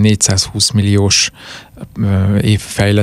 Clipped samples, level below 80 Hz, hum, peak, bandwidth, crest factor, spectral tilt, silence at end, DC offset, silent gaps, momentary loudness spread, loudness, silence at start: under 0.1%; -38 dBFS; none; 0 dBFS; 15.5 kHz; 12 dB; -4 dB/octave; 0 s; under 0.1%; none; 20 LU; -13 LUFS; 0 s